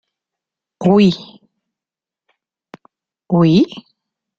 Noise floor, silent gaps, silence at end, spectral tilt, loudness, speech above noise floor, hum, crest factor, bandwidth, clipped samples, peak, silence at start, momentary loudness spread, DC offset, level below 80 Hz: -89 dBFS; none; 0.6 s; -8 dB/octave; -14 LUFS; 76 dB; none; 16 dB; 7.6 kHz; under 0.1%; -2 dBFS; 0.8 s; 13 LU; under 0.1%; -56 dBFS